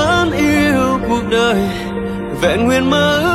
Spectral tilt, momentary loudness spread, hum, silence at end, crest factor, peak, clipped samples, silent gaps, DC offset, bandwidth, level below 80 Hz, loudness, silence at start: -5 dB/octave; 9 LU; none; 0 s; 12 dB; -2 dBFS; under 0.1%; none; under 0.1%; 16 kHz; -34 dBFS; -15 LUFS; 0 s